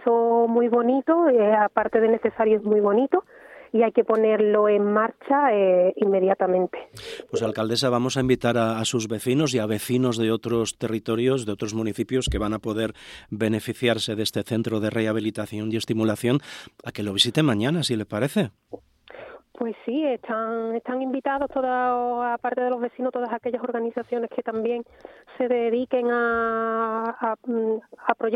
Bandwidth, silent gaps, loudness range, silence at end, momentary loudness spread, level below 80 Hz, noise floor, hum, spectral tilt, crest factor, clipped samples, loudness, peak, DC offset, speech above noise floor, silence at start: 15.5 kHz; none; 6 LU; 0 s; 9 LU; -50 dBFS; -43 dBFS; none; -5.5 dB/octave; 20 dB; under 0.1%; -23 LUFS; -4 dBFS; under 0.1%; 20 dB; 0 s